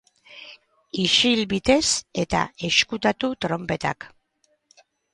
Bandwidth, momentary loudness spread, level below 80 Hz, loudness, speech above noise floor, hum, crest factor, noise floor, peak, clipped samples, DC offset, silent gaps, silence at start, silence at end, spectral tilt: 11.5 kHz; 20 LU; -50 dBFS; -21 LUFS; 46 dB; none; 22 dB; -68 dBFS; -4 dBFS; under 0.1%; under 0.1%; none; 0.3 s; 1.05 s; -3 dB/octave